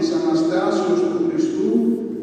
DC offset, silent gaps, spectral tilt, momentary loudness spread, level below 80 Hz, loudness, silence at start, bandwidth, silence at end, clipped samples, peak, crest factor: under 0.1%; none; -6 dB/octave; 2 LU; -66 dBFS; -19 LUFS; 0 s; 9 kHz; 0 s; under 0.1%; -6 dBFS; 14 dB